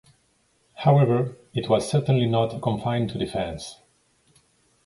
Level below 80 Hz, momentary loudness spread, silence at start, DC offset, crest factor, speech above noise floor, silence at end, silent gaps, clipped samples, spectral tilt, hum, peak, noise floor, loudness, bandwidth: -52 dBFS; 12 LU; 0.8 s; under 0.1%; 18 dB; 43 dB; 1.1 s; none; under 0.1%; -7 dB/octave; none; -6 dBFS; -66 dBFS; -23 LUFS; 11.5 kHz